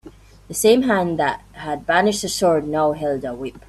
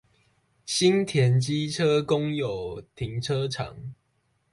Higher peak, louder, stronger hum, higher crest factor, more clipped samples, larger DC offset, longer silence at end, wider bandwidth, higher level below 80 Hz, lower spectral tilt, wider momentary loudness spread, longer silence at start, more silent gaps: first, -2 dBFS vs -10 dBFS; first, -19 LUFS vs -25 LUFS; neither; about the same, 18 dB vs 16 dB; neither; neither; second, 0.1 s vs 0.6 s; first, 14.5 kHz vs 11.5 kHz; first, -48 dBFS vs -56 dBFS; second, -4 dB/octave vs -5.5 dB/octave; about the same, 13 LU vs 15 LU; second, 0.05 s vs 0.65 s; neither